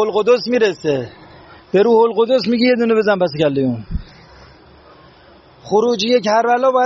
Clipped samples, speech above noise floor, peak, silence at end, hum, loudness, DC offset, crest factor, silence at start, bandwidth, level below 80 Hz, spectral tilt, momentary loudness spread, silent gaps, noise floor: under 0.1%; 31 dB; -2 dBFS; 0 s; none; -15 LUFS; under 0.1%; 14 dB; 0 s; 7.6 kHz; -40 dBFS; -4 dB/octave; 8 LU; none; -45 dBFS